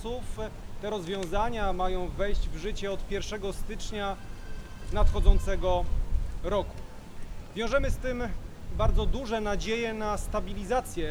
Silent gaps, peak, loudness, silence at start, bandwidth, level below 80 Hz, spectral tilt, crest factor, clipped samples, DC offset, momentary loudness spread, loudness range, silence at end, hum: none; -6 dBFS; -32 LUFS; 0 s; 12.5 kHz; -30 dBFS; -5.5 dB/octave; 22 dB; under 0.1%; under 0.1%; 12 LU; 3 LU; 0 s; none